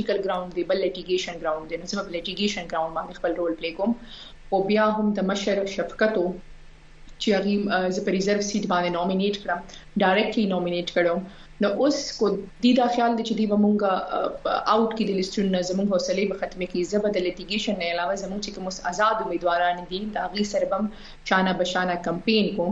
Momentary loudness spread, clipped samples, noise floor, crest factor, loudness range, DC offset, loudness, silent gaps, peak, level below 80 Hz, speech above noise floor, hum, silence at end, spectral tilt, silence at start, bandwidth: 9 LU; under 0.1%; -45 dBFS; 18 dB; 4 LU; under 0.1%; -25 LUFS; none; -6 dBFS; -50 dBFS; 21 dB; none; 0 s; -5 dB/octave; 0 s; 8 kHz